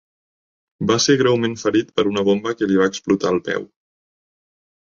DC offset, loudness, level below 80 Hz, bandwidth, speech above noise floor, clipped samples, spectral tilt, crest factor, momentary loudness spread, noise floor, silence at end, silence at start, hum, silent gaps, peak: under 0.1%; -19 LUFS; -56 dBFS; 7.6 kHz; over 72 dB; under 0.1%; -4.5 dB/octave; 18 dB; 7 LU; under -90 dBFS; 1.2 s; 0.8 s; none; none; -2 dBFS